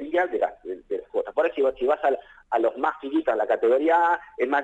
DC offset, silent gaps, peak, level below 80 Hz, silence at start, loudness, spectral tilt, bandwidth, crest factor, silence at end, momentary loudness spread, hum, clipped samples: under 0.1%; none; -10 dBFS; -60 dBFS; 0 s; -24 LUFS; -5 dB/octave; 8 kHz; 14 dB; 0 s; 9 LU; none; under 0.1%